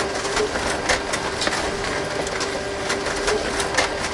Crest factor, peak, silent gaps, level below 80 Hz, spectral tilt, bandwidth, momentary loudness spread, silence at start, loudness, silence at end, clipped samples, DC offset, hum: 18 dB; -4 dBFS; none; -40 dBFS; -2.5 dB/octave; 11.5 kHz; 4 LU; 0 s; -22 LUFS; 0 s; under 0.1%; under 0.1%; none